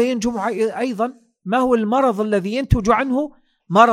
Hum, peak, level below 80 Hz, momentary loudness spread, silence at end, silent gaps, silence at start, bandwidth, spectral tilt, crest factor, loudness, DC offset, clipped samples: none; 0 dBFS; -36 dBFS; 8 LU; 0 s; none; 0 s; 15 kHz; -6.5 dB/octave; 18 dB; -19 LUFS; under 0.1%; under 0.1%